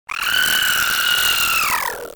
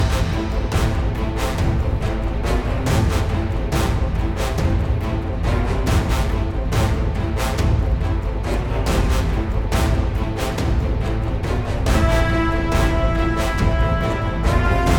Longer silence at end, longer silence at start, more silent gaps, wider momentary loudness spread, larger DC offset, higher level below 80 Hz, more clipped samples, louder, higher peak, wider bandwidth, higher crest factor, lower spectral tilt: about the same, 0 s vs 0 s; about the same, 0.1 s vs 0 s; neither; about the same, 4 LU vs 4 LU; neither; second, -48 dBFS vs -22 dBFS; neither; first, -16 LUFS vs -21 LUFS; about the same, -4 dBFS vs -4 dBFS; about the same, 19.5 kHz vs 18 kHz; about the same, 14 dB vs 14 dB; second, 1 dB/octave vs -6 dB/octave